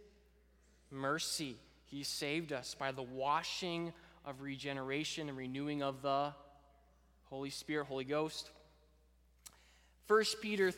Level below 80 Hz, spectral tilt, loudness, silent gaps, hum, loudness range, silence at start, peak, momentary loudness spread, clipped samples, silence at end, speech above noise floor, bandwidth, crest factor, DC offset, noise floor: -70 dBFS; -3.5 dB/octave; -39 LUFS; none; none; 5 LU; 0 s; -18 dBFS; 18 LU; under 0.1%; 0 s; 30 dB; 17.5 kHz; 22 dB; under 0.1%; -69 dBFS